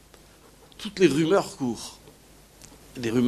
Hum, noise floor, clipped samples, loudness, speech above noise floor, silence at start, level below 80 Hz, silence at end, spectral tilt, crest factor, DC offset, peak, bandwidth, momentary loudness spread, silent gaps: none; -53 dBFS; under 0.1%; -25 LUFS; 29 dB; 0.8 s; -58 dBFS; 0 s; -5.5 dB/octave; 20 dB; under 0.1%; -6 dBFS; 14.5 kHz; 18 LU; none